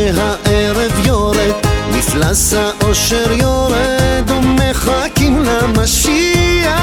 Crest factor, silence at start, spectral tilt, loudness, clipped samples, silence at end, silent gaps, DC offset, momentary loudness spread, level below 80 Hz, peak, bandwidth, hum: 12 dB; 0 s; -4 dB/octave; -12 LUFS; under 0.1%; 0 s; none; under 0.1%; 3 LU; -22 dBFS; 0 dBFS; 20 kHz; none